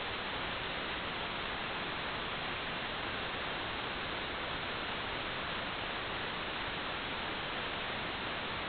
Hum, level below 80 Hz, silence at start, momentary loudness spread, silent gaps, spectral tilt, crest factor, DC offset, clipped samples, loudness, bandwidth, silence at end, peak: none; -56 dBFS; 0 s; 0 LU; none; -1 dB/octave; 14 dB; under 0.1%; under 0.1%; -37 LUFS; 4.9 kHz; 0 s; -24 dBFS